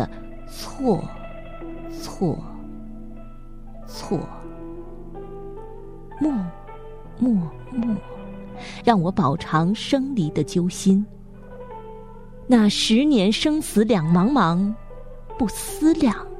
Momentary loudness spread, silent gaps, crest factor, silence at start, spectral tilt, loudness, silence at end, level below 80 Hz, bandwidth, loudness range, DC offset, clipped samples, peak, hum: 23 LU; none; 20 dB; 0 s; -6 dB/octave; -21 LUFS; 0 s; -40 dBFS; 15.5 kHz; 13 LU; under 0.1%; under 0.1%; -4 dBFS; none